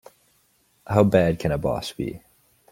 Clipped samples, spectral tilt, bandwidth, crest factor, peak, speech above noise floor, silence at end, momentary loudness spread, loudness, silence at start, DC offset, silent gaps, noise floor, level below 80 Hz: under 0.1%; -7 dB/octave; 16.5 kHz; 22 dB; -2 dBFS; 42 dB; 0.55 s; 14 LU; -23 LUFS; 0.9 s; under 0.1%; none; -64 dBFS; -46 dBFS